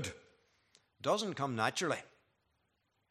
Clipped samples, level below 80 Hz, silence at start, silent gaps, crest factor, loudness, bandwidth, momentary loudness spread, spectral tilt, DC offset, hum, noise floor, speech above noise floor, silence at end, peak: under 0.1%; -78 dBFS; 0 s; none; 24 dB; -36 LUFS; 14 kHz; 10 LU; -4 dB/octave; under 0.1%; none; -80 dBFS; 45 dB; 1.05 s; -16 dBFS